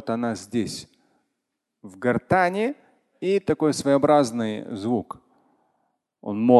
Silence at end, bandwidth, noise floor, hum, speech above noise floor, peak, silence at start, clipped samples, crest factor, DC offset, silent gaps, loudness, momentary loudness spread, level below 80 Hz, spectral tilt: 0 s; 12.5 kHz; -81 dBFS; none; 59 dB; -2 dBFS; 0.05 s; under 0.1%; 22 dB; under 0.1%; none; -24 LUFS; 16 LU; -58 dBFS; -6 dB/octave